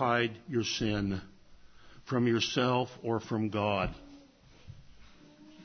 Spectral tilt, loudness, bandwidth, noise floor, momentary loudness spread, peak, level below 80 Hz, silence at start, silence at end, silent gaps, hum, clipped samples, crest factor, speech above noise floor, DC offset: -5 dB/octave; -31 LUFS; 6.6 kHz; -57 dBFS; 8 LU; -12 dBFS; -54 dBFS; 0 s; 0 s; none; none; under 0.1%; 20 dB; 26 dB; under 0.1%